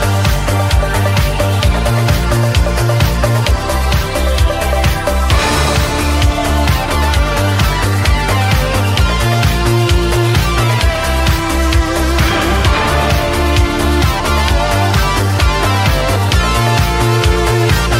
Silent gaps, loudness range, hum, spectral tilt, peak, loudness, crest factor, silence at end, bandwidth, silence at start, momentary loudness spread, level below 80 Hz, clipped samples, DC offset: none; 1 LU; none; -5 dB/octave; 0 dBFS; -13 LUFS; 12 dB; 0 s; 16.5 kHz; 0 s; 2 LU; -16 dBFS; under 0.1%; under 0.1%